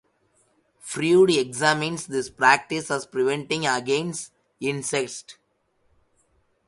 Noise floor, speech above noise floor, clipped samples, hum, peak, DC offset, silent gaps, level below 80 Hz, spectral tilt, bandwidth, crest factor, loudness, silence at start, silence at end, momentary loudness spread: -68 dBFS; 45 dB; under 0.1%; none; -2 dBFS; under 0.1%; none; -66 dBFS; -4 dB/octave; 11.5 kHz; 22 dB; -23 LUFS; 0.85 s; 1.35 s; 15 LU